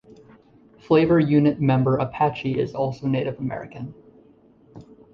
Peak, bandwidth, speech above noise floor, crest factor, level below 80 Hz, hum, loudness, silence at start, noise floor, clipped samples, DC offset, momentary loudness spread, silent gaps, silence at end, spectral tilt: -6 dBFS; 6.6 kHz; 33 dB; 18 dB; -54 dBFS; none; -21 LUFS; 0.9 s; -54 dBFS; under 0.1%; under 0.1%; 15 LU; none; 0.3 s; -9.5 dB/octave